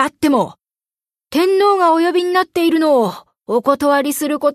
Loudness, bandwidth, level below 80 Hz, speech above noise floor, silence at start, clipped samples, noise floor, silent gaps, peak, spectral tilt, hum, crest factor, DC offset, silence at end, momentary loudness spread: -15 LUFS; 13.5 kHz; -58 dBFS; over 75 dB; 0 s; under 0.1%; under -90 dBFS; none; -2 dBFS; -4 dB/octave; none; 14 dB; under 0.1%; 0 s; 8 LU